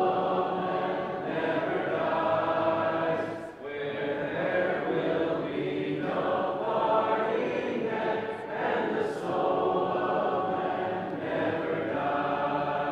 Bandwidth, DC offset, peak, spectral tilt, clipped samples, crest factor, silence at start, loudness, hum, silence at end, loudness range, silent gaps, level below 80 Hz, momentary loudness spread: 10.5 kHz; under 0.1%; -14 dBFS; -7 dB/octave; under 0.1%; 14 dB; 0 s; -29 LUFS; none; 0 s; 1 LU; none; -64 dBFS; 5 LU